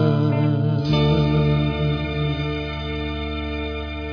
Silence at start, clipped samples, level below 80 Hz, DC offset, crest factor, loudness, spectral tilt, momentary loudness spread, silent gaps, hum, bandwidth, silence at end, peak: 0 s; under 0.1%; -32 dBFS; under 0.1%; 16 dB; -22 LUFS; -8.5 dB/octave; 9 LU; none; none; 5.4 kHz; 0 s; -6 dBFS